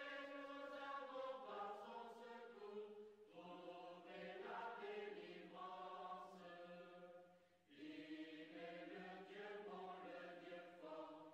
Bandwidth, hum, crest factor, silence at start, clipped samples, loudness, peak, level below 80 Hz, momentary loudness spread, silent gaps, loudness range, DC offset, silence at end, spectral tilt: 9.6 kHz; none; 14 dB; 0 s; under 0.1%; -56 LUFS; -42 dBFS; under -90 dBFS; 8 LU; none; 3 LU; under 0.1%; 0 s; -5.5 dB/octave